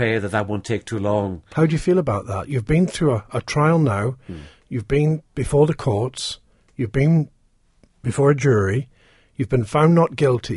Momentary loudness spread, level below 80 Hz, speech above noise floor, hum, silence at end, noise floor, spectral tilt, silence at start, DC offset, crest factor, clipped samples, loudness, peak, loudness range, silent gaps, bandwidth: 13 LU; -42 dBFS; 40 dB; none; 0 s; -59 dBFS; -7 dB/octave; 0 s; under 0.1%; 16 dB; under 0.1%; -20 LUFS; -4 dBFS; 2 LU; none; 11.5 kHz